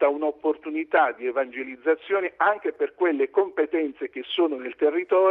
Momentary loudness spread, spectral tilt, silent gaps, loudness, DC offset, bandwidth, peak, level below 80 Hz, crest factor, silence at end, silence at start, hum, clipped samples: 7 LU; -6 dB/octave; none; -25 LUFS; under 0.1%; 4 kHz; -6 dBFS; -72 dBFS; 16 dB; 0 s; 0 s; none; under 0.1%